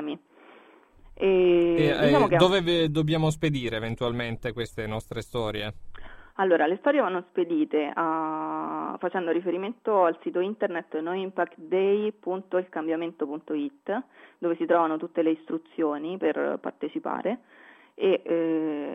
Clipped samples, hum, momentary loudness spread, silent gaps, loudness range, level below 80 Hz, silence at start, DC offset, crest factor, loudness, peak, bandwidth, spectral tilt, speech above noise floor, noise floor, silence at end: under 0.1%; none; 12 LU; none; 6 LU; -52 dBFS; 0 s; under 0.1%; 20 dB; -26 LUFS; -6 dBFS; 12.5 kHz; -6.5 dB/octave; 28 dB; -54 dBFS; 0 s